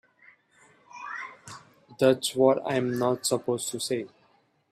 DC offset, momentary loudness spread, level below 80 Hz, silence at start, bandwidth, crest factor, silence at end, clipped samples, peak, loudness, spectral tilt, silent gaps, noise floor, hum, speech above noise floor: under 0.1%; 21 LU; -72 dBFS; 0.95 s; 15.5 kHz; 22 dB; 0.65 s; under 0.1%; -8 dBFS; -27 LUFS; -4 dB/octave; none; -65 dBFS; none; 40 dB